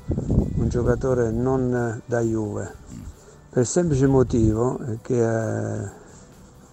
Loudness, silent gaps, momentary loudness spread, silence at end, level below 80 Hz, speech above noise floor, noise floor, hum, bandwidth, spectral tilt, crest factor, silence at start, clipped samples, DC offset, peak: -23 LUFS; none; 15 LU; 0.25 s; -36 dBFS; 25 dB; -47 dBFS; none; 9.2 kHz; -7.5 dB/octave; 18 dB; 0 s; under 0.1%; under 0.1%; -6 dBFS